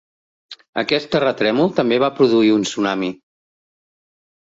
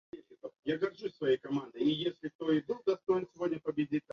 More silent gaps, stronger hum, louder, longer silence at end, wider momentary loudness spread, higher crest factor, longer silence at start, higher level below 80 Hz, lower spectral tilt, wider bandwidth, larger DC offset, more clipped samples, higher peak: about the same, 0.69-0.73 s vs 0.59-0.63 s, 2.35-2.39 s; neither; first, -18 LUFS vs -34 LUFS; first, 1.45 s vs 0.15 s; about the same, 9 LU vs 8 LU; about the same, 16 dB vs 16 dB; first, 0.5 s vs 0.15 s; first, -60 dBFS vs -76 dBFS; second, -5 dB/octave vs -7 dB/octave; first, 7.8 kHz vs 6.8 kHz; neither; neither; first, -2 dBFS vs -18 dBFS